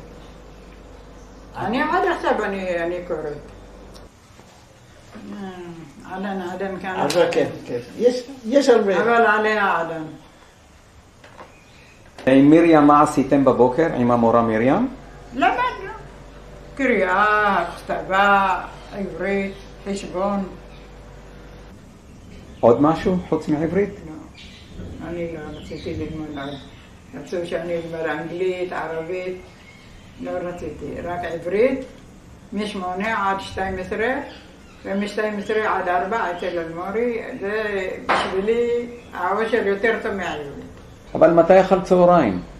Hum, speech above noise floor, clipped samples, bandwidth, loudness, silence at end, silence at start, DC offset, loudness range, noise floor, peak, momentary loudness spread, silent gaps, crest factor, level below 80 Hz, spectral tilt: none; 29 dB; under 0.1%; 13.5 kHz; -20 LUFS; 0 s; 0 s; under 0.1%; 12 LU; -49 dBFS; 0 dBFS; 19 LU; none; 20 dB; -46 dBFS; -6 dB/octave